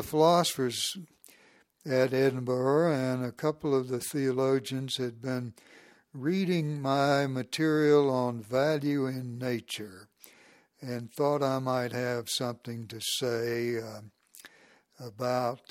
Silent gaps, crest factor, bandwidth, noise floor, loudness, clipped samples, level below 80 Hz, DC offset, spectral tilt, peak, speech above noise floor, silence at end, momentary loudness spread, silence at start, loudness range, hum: none; 20 dB; 16.5 kHz; -62 dBFS; -29 LUFS; under 0.1%; -70 dBFS; under 0.1%; -5 dB/octave; -10 dBFS; 33 dB; 0.15 s; 14 LU; 0 s; 5 LU; none